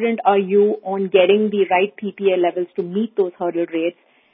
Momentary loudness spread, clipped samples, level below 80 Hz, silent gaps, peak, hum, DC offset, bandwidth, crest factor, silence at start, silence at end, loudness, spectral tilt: 8 LU; under 0.1%; -74 dBFS; none; 0 dBFS; none; under 0.1%; 3.8 kHz; 18 dB; 0 s; 0.4 s; -19 LUFS; -11 dB/octave